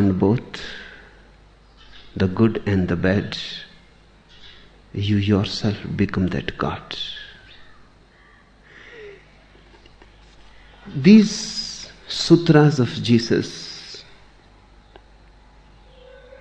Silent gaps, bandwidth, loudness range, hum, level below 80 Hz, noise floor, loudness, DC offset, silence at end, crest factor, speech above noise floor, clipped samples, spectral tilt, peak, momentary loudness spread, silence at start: none; 9.2 kHz; 12 LU; none; -48 dBFS; -51 dBFS; -20 LUFS; under 0.1%; 2.4 s; 20 dB; 33 dB; under 0.1%; -6 dB/octave; -2 dBFS; 24 LU; 0 s